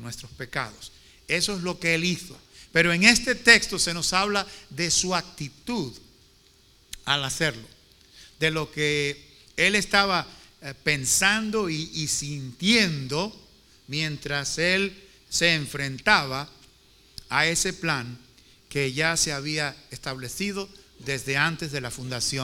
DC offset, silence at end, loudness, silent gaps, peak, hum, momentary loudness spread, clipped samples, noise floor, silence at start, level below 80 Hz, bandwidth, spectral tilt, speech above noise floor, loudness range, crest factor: under 0.1%; 0 s; -24 LUFS; none; 0 dBFS; none; 17 LU; under 0.1%; -58 dBFS; 0 s; -52 dBFS; 19 kHz; -2.5 dB/octave; 32 dB; 7 LU; 26 dB